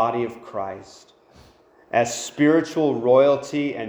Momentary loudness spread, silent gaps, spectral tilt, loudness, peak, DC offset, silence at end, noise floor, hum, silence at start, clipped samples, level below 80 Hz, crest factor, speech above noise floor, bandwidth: 14 LU; none; -5 dB/octave; -21 LUFS; -6 dBFS; under 0.1%; 0 s; -53 dBFS; none; 0 s; under 0.1%; -64 dBFS; 16 dB; 32 dB; over 20 kHz